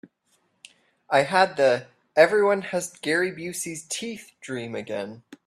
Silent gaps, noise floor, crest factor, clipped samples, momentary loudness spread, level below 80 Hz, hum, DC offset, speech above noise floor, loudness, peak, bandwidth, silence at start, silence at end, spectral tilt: none; -69 dBFS; 22 dB; under 0.1%; 15 LU; -72 dBFS; none; under 0.1%; 45 dB; -24 LUFS; -4 dBFS; 14 kHz; 1.1 s; 0.1 s; -3.5 dB/octave